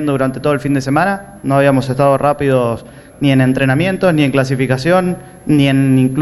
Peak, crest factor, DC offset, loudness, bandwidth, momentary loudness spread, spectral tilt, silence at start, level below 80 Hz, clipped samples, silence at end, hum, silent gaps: -2 dBFS; 12 dB; under 0.1%; -14 LUFS; 12 kHz; 6 LU; -7 dB/octave; 0 s; -42 dBFS; under 0.1%; 0 s; none; none